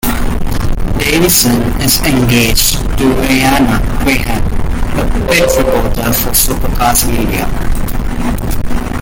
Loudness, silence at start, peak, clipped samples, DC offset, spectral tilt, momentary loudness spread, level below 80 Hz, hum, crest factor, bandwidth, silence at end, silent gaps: -12 LUFS; 0.05 s; 0 dBFS; under 0.1%; under 0.1%; -4 dB/octave; 10 LU; -16 dBFS; none; 10 dB; 17.5 kHz; 0 s; none